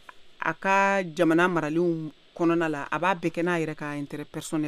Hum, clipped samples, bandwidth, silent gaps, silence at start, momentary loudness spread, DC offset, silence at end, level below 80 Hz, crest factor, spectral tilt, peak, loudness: none; under 0.1%; 13.5 kHz; none; 0.15 s; 12 LU; under 0.1%; 0 s; -64 dBFS; 18 dB; -6 dB/octave; -8 dBFS; -26 LUFS